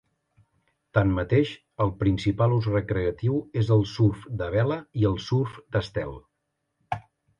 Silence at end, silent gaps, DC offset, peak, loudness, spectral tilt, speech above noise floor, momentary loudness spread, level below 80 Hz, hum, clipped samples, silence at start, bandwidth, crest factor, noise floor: 0.4 s; none; under 0.1%; -6 dBFS; -26 LUFS; -8 dB/octave; 54 dB; 10 LU; -44 dBFS; none; under 0.1%; 0.95 s; 7.2 kHz; 20 dB; -78 dBFS